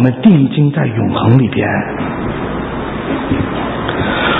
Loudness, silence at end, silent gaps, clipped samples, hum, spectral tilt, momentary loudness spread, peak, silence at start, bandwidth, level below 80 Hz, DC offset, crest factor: -14 LUFS; 0 s; none; 0.1%; none; -10.5 dB/octave; 10 LU; 0 dBFS; 0 s; 4 kHz; -32 dBFS; under 0.1%; 14 dB